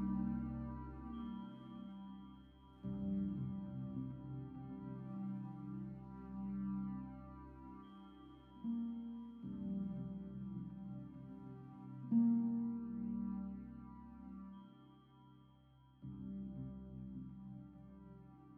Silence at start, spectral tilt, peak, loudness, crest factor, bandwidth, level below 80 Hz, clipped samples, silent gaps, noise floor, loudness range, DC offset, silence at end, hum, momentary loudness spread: 0 s; -10 dB/octave; -24 dBFS; -45 LUFS; 20 dB; 3.4 kHz; -62 dBFS; under 0.1%; none; -66 dBFS; 11 LU; under 0.1%; 0 s; none; 17 LU